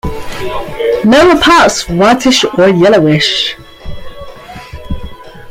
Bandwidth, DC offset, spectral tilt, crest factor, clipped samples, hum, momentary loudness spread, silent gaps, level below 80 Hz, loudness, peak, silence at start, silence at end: 16.5 kHz; under 0.1%; -4.5 dB/octave; 10 dB; under 0.1%; none; 24 LU; none; -30 dBFS; -8 LUFS; 0 dBFS; 0.05 s; 0 s